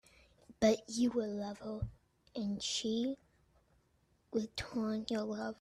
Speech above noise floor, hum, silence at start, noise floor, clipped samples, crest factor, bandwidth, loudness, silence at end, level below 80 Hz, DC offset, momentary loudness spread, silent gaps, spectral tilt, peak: 38 dB; none; 0.5 s; -74 dBFS; under 0.1%; 20 dB; 13 kHz; -37 LUFS; 0.05 s; -60 dBFS; under 0.1%; 11 LU; none; -4.5 dB/octave; -18 dBFS